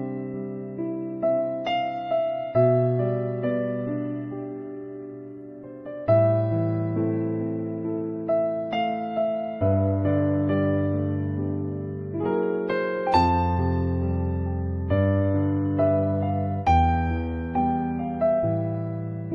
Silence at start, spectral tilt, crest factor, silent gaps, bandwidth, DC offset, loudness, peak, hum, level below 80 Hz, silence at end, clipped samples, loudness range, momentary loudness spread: 0 s; -9.5 dB/octave; 16 dB; none; 6 kHz; under 0.1%; -25 LUFS; -8 dBFS; none; -42 dBFS; 0 s; under 0.1%; 3 LU; 11 LU